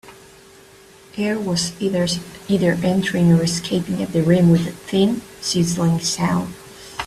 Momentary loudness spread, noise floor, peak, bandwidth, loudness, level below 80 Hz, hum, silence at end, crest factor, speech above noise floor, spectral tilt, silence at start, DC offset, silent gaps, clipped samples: 9 LU; -46 dBFS; -4 dBFS; 14 kHz; -19 LUFS; -50 dBFS; none; 0 s; 16 dB; 28 dB; -5.5 dB/octave; 0.05 s; under 0.1%; none; under 0.1%